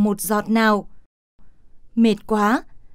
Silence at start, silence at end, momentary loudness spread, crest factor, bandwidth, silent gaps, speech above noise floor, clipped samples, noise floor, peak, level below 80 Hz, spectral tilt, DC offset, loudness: 0 s; 0 s; 6 LU; 14 dB; 16 kHz; 1.06-1.39 s; 23 dB; under 0.1%; -42 dBFS; -6 dBFS; -50 dBFS; -5 dB/octave; under 0.1%; -20 LUFS